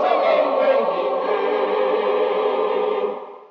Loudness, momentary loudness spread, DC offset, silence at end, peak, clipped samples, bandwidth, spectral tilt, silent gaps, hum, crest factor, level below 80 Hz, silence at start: -20 LUFS; 5 LU; under 0.1%; 0.05 s; -6 dBFS; under 0.1%; 6 kHz; -1.5 dB/octave; none; none; 14 dB; under -90 dBFS; 0 s